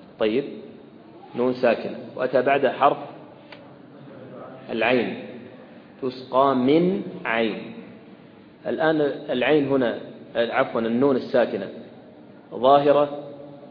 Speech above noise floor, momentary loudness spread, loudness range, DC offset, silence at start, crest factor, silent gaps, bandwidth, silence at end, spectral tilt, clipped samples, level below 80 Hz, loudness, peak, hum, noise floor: 26 dB; 22 LU; 3 LU; under 0.1%; 0 s; 20 dB; none; 5.4 kHz; 0 s; -8.5 dB/octave; under 0.1%; -66 dBFS; -22 LUFS; -4 dBFS; none; -47 dBFS